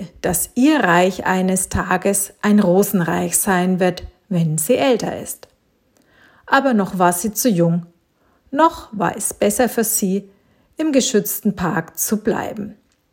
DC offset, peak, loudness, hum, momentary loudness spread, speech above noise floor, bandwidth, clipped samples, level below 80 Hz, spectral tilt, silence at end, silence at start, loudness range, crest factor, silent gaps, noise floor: under 0.1%; 0 dBFS; -18 LUFS; none; 9 LU; 43 dB; 17 kHz; under 0.1%; -46 dBFS; -4.5 dB/octave; 0.4 s; 0 s; 4 LU; 18 dB; none; -60 dBFS